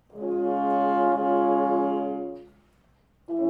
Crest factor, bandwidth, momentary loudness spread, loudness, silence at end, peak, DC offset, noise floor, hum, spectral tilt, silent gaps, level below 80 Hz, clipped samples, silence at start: 14 dB; 4.5 kHz; 12 LU; -25 LUFS; 0 s; -12 dBFS; under 0.1%; -62 dBFS; none; -9 dB/octave; none; -66 dBFS; under 0.1%; 0.15 s